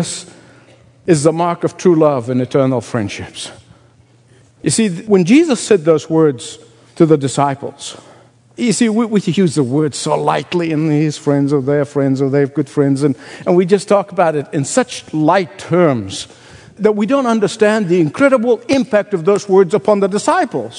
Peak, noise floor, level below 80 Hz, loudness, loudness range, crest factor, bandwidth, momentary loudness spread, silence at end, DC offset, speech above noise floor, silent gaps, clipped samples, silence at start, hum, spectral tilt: 0 dBFS; -48 dBFS; -60 dBFS; -14 LUFS; 3 LU; 14 dB; 11 kHz; 10 LU; 0 s; under 0.1%; 35 dB; none; under 0.1%; 0 s; none; -6 dB/octave